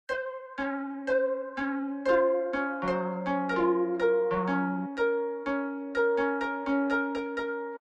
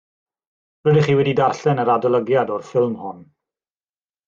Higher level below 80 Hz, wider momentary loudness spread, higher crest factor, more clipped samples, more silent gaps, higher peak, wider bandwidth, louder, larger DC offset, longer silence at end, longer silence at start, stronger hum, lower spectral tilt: about the same, -62 dBFS vs -60 dBFS; about the same, 7 LU vs 7 LU; about the same, 16 dB vs 16 dB; neither; neither; second, -12 dBFS vs -4 dBFS; first, 8.4 kHz vs 7.6 kHz; second, -29 LUFS vs -18 LUFS; neither; second, 0.05 s vs 1.05 s; second, 0.1 s vs 0.85 s; neither; about the same, -7.5 dB/octave vs -7.5 dB/octave